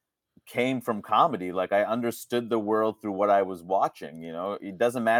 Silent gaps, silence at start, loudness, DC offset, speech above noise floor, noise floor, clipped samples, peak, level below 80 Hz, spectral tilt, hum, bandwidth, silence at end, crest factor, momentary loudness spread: none; 0.45 s; -27 LUFS; under 0.1%; 33 dB; -59 dBFS; under 0.1%; -8 dBFS; -76 dBFS; -5.5 dB/octave; none; 19 kHz; 0 s; 18 dB; 10 LU